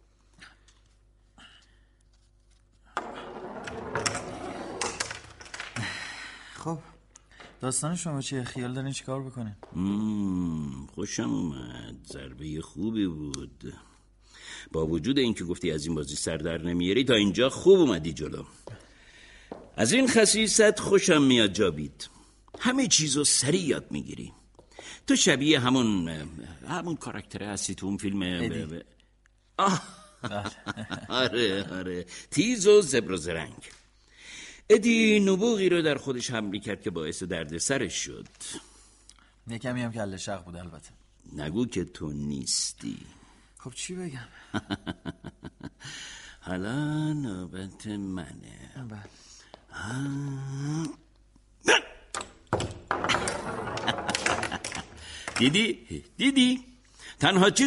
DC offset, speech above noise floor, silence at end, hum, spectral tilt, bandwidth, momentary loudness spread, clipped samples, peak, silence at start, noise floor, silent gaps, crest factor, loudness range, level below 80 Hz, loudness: under 0.1%; 36 dB; 0 s; none; -3.5 dB/octave; 11.5 kHz; 21 LU; under 0.1%; -8 dBFS; 0.4 s; -63 dBFS; none; 22 dB; 12 LU; -54 dBFS; -27 LUFS